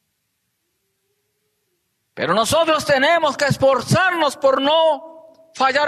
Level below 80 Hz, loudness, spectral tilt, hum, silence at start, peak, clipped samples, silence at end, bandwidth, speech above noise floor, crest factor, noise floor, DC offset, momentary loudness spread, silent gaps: -54 dBFS; -17 LUFS; -4 dB/octave; none; 2.15 s; -6 dBFS; under 0.1%; 0 s; 13.5 kHz; 55 dB; 14 dB; -72 dBFS; under 0.1%; 5 LU; none